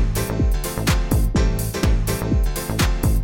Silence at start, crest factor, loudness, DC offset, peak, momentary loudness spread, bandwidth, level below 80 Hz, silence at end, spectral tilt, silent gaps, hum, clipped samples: 0 s; 16 dB; -21 LUFS; under 0.1%; -4 dBFS; 3 LU; 17 kHz; -22 dBFS; 0 s; -5.5 dB/octave; none; none; under 0.1%